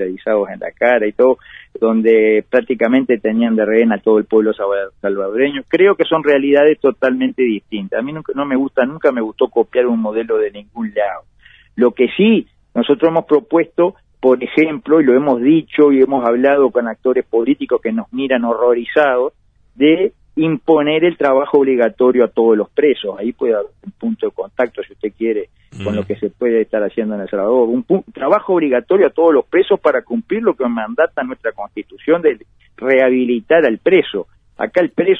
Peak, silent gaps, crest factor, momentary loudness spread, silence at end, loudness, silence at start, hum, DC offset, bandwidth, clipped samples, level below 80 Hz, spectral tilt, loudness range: 0 dBFS; none; 14 dB; 10 LU; 0 s; -15 LUFS; 0 s; none; under 0.1%; 4 kHz; under 0.1%; -56 dBFS; -8 dB/octave; 4 LU